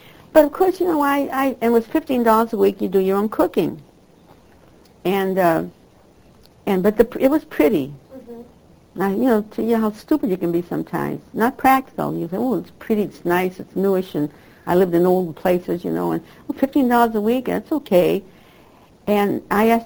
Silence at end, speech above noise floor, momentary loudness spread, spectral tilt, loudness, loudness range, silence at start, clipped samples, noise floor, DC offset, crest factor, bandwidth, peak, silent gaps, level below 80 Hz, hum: 0 s; 32 dB; 10 LU; -7 dB/octave; -19 LUFS; 3 LU; 0.35 s; under 0.1%; -50 dBFS; under 0.1%; 20 dB; over 20 kHz; 0 dBFS; none; -50 dBFS; none